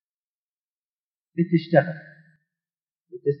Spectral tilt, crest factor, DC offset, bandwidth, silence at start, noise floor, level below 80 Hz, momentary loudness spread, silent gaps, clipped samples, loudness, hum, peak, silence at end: -11 dB/octave; 24 dB; under 0.1%; 5.6 kHz; 1.35 s; under -90 dBFS; -84 dBFS; 19 LU; 2.91-3.05 s; under 0.1%; -23 LUFS; none; -2 dBFS; 0 s